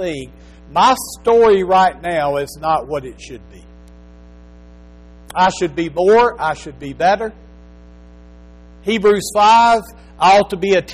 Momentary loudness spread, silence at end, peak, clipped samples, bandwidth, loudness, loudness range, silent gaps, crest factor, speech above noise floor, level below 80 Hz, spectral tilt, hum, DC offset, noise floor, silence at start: 16 LU; 0 s; -4 dBFS; under 0.1%; 14.5 kHz; -15 LUFS; 8 LU; none; 14 dB; 26 dB; -42 dBFS; -4 dB/octave; 60 Hz at -40 dBFS; under 0.1%; -40 dBFS; 0 s